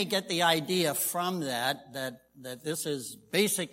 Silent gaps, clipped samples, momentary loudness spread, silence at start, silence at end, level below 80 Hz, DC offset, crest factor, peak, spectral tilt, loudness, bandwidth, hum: none; under 0.1%; 13 LU; 0 s; 0 s; -76 dBFS; under 0.1%; 20 dB; -10 dBFS; -3 dB/octave; -30 LUFS; 16.5 kHz; none